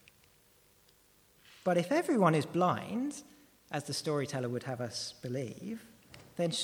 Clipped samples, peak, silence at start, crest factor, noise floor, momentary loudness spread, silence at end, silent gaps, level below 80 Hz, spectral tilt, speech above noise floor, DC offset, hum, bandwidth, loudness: under 0.1%; -12 dBFS; 1.65 s; 22 dB; -66 dBFS; 16 LU; 0 s; none; -74 dBFS; -5 dB/octave; 33 dB; under 0.1%; none; over 20 kHz; -33 LUFS